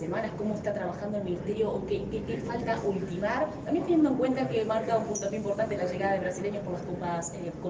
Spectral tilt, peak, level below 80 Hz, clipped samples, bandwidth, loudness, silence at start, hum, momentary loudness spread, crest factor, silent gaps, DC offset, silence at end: -6 dB/octave; -14 dBFS; -54 dBFS; under 0.1%; 9.8 kHz; -30 LUFS; 0 s; none; 7 LU; 16 dB; none; under 0.1%; 0 s